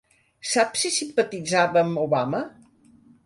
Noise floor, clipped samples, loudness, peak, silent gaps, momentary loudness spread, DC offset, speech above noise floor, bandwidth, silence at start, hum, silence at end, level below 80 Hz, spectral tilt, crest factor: -55 dBFS; under 0.1%; -23 LUFS; -6 dBFS; none; 9 LU; under 0.1%; 32 dB; 11.5 kHz; 0.45 s; none; 0.75 s; -66 dBFS; -3.5 dB/octave; 18 dB